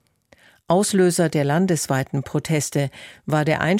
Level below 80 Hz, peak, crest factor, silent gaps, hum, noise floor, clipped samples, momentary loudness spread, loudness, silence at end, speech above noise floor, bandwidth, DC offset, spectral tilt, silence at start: -56 dBFS; -6 dBFS; 16 dB; none; none; -55 dBFS; under 0.1%; 7 LU; -21 LUFS; 0 s; 35 dB; 16.5 kHz; under 0.1%; -5.5 dB/octave; 0.7 s